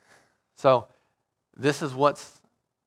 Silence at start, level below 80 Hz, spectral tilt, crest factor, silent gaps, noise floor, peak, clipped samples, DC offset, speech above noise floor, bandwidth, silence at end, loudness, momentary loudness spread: 0.65 s; -74 dBFS; -5.5 dB/octave; 24 dB; none; -76 dBFS; -4 dBFS; under 0.1%; under 0.1%; 52 dB; 14.5 kHz; 0.6 s; -25 LUFS; 6 LU